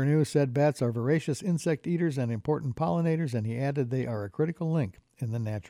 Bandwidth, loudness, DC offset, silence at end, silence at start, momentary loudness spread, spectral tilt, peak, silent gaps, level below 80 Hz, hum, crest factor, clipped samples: 13.5 kHz; -29 LUFS; under 0.1%; 0 s; 0 s; 6 LU; -7.5 dB/octave; -14 dBFS; none; -62 dBFS; none; 14 dB; under 0.1%